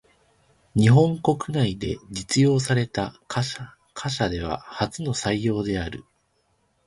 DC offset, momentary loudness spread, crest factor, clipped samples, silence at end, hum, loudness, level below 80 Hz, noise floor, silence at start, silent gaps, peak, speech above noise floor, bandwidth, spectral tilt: under 0.1%; 14 LU; 20 dB; under 0.1%; 0.85 s; none; -24 LUFS; -46 dBFS; -68 dBFS; 0.75 s; none; -4 dBFS; 45 dB; 11.5 kHz; -6 dB/octave